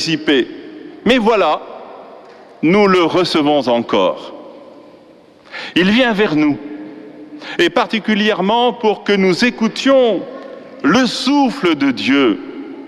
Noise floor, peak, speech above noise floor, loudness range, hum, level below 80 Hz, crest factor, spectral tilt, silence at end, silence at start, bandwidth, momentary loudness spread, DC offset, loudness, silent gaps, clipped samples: -44 dBFS; -2 dBFS; 30 dB; 3 LU; none; -50 dBFS; 14 dB; -5 dB/octave; 0 s; 0 s; 12.5 kHz; 20 LU; under 0.1%; -14 LUFS; none; under 0.1%